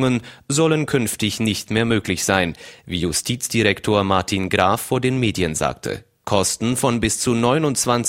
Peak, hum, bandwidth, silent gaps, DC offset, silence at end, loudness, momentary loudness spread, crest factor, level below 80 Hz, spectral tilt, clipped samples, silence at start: 0 dBFS; none; 16.5 kHz; none; under 0.1%; 0 s; -20 LUFS; 6 LU; 20 dB; -44 dBFS; -4 dB/octave; under 0.1%; 0 s